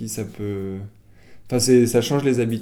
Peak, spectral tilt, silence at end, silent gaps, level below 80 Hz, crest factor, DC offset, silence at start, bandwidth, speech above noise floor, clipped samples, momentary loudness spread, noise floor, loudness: -6 dBFS; -5 dB/octave; 0 s; none; -54 dBFS; 16 dB; under 0.1%; 0 s; 17.5 kHz; 24 dB; under 0.1%; 16 LU; -44 dBFS; -20 LUFS